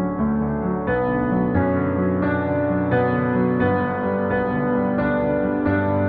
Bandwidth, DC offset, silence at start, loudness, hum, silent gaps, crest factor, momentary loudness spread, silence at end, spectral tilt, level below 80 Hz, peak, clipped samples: 4.5 kHz; under 0.1%; 0 s; -21 LUFS; none; none; 12 dB; 2 LU; 0 s; -11.5 dB/octave; -42 dBFS; -8 dBFS; under 0.1%